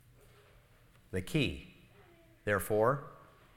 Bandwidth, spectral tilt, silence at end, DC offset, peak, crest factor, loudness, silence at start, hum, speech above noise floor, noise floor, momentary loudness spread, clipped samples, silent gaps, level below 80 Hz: 17 kHz; -5.5 dB/octave; 0.35 s; under 0.1%; -16 dBFS; 22 dB; -34 LUFS; 1.1 s; none; 31 dB; -63 dBFS; 19 LU; under 0.1%; none; -56 dBFS